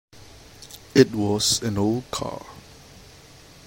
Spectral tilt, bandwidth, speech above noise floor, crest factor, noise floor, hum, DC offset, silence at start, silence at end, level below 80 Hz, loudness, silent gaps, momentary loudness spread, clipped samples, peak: -4 dB/octave; 16.5 kHz; 26 dB; 24 dB; -48 dBFS; none; under 0.1%; 0.15 s; 1.05 s; -52 dBFS; -22 LUFS; none; 23 LU; under 0.1%; -2 dBFS